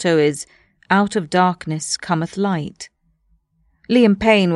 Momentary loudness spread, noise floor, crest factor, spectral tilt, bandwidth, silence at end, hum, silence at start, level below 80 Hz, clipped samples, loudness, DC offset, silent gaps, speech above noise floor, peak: 17 LU; -62 dBFS; 18 dB; -5 dB/octave; 12 kHz; 0 s; none; 0 s; -50 dBFS; under 0.1%; -18 LUFS; under 0.1%; none; 45 dB; -2 dBFS